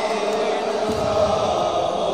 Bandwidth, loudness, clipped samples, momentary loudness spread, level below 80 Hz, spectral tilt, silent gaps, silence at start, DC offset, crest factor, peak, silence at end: 15 kHz; -21 LUFS; under 0.1%; 3 LU; -46 dBFS; -4.5 dB/octave; none; 0 s; 0.3%; 12 dB; -8 dBFS; 0 s